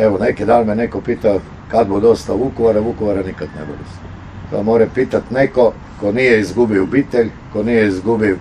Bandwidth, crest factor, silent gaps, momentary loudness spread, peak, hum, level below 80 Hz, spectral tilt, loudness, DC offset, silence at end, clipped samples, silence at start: 10.5 kHz; 14 dB; none; 14 LU; 0 dBFS; none; -38 dBFS; -7 dB/octave; -15 LUFS; under 0.1%; 0 s; under 0.1%; 0 s